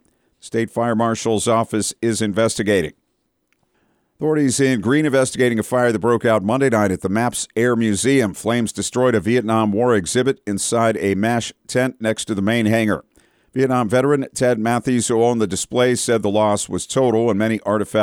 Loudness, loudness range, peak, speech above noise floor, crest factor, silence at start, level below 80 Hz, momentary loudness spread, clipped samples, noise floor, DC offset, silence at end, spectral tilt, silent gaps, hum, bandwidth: -18 LUFS; 2 LU; -6 dBFS; 51 dB; 14 dB; 0.45 s; -54 dBFS; 5 LU; under 0.1%; -69 dBFS; under 0.1%; 0 s; -5 dB/octave; none; none; 16.5 kHz